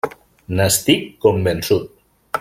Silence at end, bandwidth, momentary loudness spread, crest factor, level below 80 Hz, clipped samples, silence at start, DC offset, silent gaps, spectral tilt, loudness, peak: 0 s; 16.5 kHz; 12 LU; 18 dB; -48 dBFS; under 0.1%; 0.05 s; under 0.1%; none; -4 dB/octave; -18 LUFS; -2 dBFS